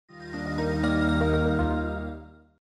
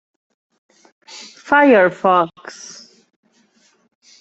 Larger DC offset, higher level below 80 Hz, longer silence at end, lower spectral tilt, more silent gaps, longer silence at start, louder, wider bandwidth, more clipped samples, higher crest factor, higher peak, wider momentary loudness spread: neither; first, -36 dBFS vs -66 dBFS; second, 0.3 s vs 1.5 s; first, -7.5 dB/octave vs -5 dB/octave; neither; second, 0.1 s vs 1.15 s; second, -26 LUFS vs -14 LUFS; first, 10.5 kHz vs 8.2 kHz; neither; about the same, 14 dB vs 18 dB; second, -12 dBFS vs -2 dBFS; second, 14 LU vs 25 LU